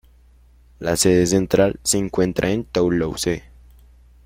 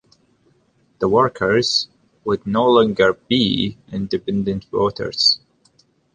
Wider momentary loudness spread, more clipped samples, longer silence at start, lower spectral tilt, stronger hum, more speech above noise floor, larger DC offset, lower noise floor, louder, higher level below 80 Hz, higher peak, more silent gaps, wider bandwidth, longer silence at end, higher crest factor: about the same, 8 LU vs 9 LU; neither; second, 0.8 s vs 1 s; about the same, -4.5 dB/octave vs -4.5 dB/octave; first, 60 Hz at -45 dBFS vs none; second, 32 dB vs 42 dB; neither; second, -51 dBFS vs -60 dBFS; about the same, -20 LUFS vs -18 LUFS; first, -42 dBFS vs -50 dBFS; about the same, -2 dBFS vs -2 dBFS; neither; first, 16.5 kHz vs 9.8 kHz; about the same, 0.85 s vs 0.75 s; about the same, 18 dB vs 18 dB